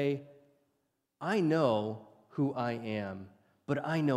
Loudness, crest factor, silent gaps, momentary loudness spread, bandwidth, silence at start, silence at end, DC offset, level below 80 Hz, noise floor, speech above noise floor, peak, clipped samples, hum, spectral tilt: -33 LUFS; 20 dB; none; 16 LU; 12.5 kHz; 0 s; 0 s; under 0.1%; -78 dBFS; -80 dBFS; 49 dB; -14 dBFS; under 0.1%; none; -7.5 dB/octave